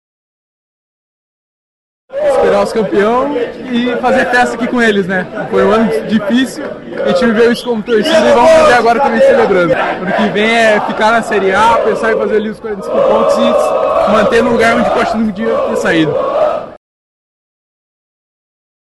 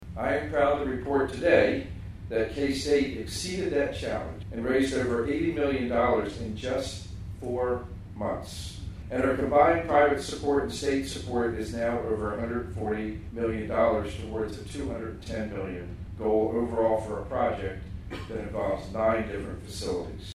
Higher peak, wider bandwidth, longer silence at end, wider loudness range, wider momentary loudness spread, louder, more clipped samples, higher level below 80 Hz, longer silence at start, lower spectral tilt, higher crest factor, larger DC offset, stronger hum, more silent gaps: first, 0 dBFS vs -8 dBFS; second, 12.5 kHz vs 14.5 kHz; first, 2.1 s vs 0 s; about the same, 6 LU vs 5 LU; second, 8 LU vs 13 LU; first, -11 LUFS vs -28 LUFS; neither; about the same, -42 dBFS vs -44 dBFS; first, 2.1 s vs 0 s; about the same, -5 dB/octave vs -5.5 dB/octave; second, 12 dB vs 20 dB; neither; neither; neither